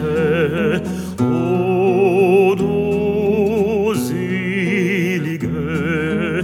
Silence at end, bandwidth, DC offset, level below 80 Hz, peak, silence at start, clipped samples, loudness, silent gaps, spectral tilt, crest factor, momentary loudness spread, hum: 0 s; 16 kHz; under 0.1%; -44 dBFS; -4 dBFS; 0 s; under 0.1%; -17 LUFS; none; -7 dB/octave; 14 dB; 7 LU; none